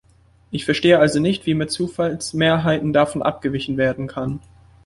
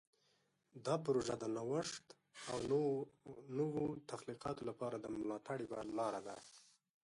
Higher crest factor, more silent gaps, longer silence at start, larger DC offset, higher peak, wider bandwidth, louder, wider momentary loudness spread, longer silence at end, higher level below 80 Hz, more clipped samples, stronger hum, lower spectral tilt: about the same, 18 dB vs 18 dB; neither; second, 0.5 s vs 0.75 s; neither; first, -2 dBFS vs -26 dBFS; about the same, 11.5 kHz vs 11.5 kHz; first, -19 LUFS vs -43 LUFS; second, 12 LU vs 15 LU; about the same, 0.45 s vs 0.45 s; first, -48 dBFS vs -74 dBFS; neither; neither; about the same, -5.5 dB/octave vs -5.5 dB/octave